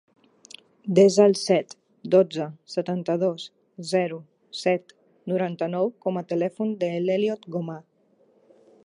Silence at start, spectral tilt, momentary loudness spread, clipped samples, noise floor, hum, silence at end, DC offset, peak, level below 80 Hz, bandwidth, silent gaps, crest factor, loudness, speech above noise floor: 0.85 s; -6 dB/octave; 19 LU; under 0.1%; -62 dBFS; none; 1.05 s; under 0.1%; -4 dBFS; -78 dBFS; 11.5 kHz; none; 20 dB; -24 LUFS; 39 dB